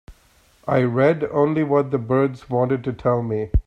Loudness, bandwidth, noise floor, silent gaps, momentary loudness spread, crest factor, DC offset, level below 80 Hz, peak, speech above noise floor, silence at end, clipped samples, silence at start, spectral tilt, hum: -20 LUFS; 8.2 kHz; -56 dBFS; none; 5 LU; 16 dB; under 0.1%; -34 dBFS; -6 dBFS; 37 dB; 0.05 s; under 0.1%; 0.1 s; -9.5 dB/octave; none